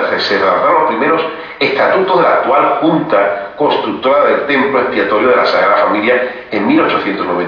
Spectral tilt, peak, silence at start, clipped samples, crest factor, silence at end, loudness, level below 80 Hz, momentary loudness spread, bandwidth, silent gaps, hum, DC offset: -6.5 dB/octave; 0 dBFS; 0 s; under 0.1%; 12 dB; 0 s; -12 LUFS; -54 dBFS; 5 LU; 5.4 kHz; none; none; under 0.1%